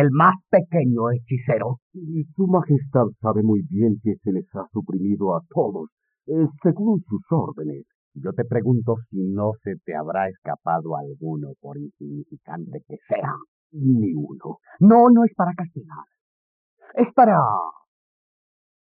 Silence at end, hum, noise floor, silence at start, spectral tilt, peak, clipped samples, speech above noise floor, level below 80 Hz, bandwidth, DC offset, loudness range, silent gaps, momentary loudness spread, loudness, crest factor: 1.15 s; none; under -90 dBFS; 0 s; -9.5 dB/octave; -4 dBFS; under 0.1%; over 69 dB; -70 dBFS; 3.2 kHz; under 0.1%; 9 LU; 1.82-1.91 s, 5.92-5.97 s, 7.95-8.11 s, 10.38-10.42 s, 13.48-13.70 s, 16.21-16.77 s; 20 LU; -21 LUFS; 18 dB